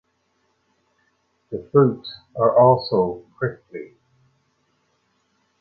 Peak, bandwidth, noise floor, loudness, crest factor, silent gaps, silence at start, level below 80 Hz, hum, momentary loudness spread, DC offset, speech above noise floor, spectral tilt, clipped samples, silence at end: -2 dBFS; 5 kHz; -68 dBFS; -19 LUFS; 20 dB; none; 1.5 s; -60 dBFS; none; 22 LU; under 0.1%; 49 dB; -10 dB/octave; under 0.1%; 1.75 s